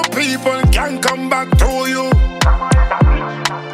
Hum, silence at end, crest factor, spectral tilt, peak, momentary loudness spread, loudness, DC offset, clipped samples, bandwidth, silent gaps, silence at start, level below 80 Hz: none; 0 s; 14 dB; -5 dB/octave; 0 dBFS; 4 LU; -15 LUFS; under 0.1%; under 0.1%; 15.5 kHz; none; 0 s; -16 dBFS